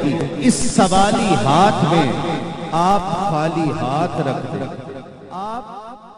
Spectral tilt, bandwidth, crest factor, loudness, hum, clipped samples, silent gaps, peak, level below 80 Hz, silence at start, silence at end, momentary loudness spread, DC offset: -5 dB/octave; 11.5 kHz; 16 dB; -18 LUFS; none; under 0.1%; none; -2 dBFS; -40 dBFS; 0 s; 0.05 s; 17 LU; under 0.1%